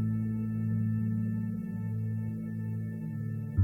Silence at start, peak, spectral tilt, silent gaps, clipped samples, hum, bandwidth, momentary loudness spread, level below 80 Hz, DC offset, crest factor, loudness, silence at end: 0 s; -16 dBFS; -11.5 dB/octave; none; under 0.1%; none; 2.8 kHz; 5 LU; -52 dBFS; under 0.1%; 16 dB; -34 LUFS; 0 s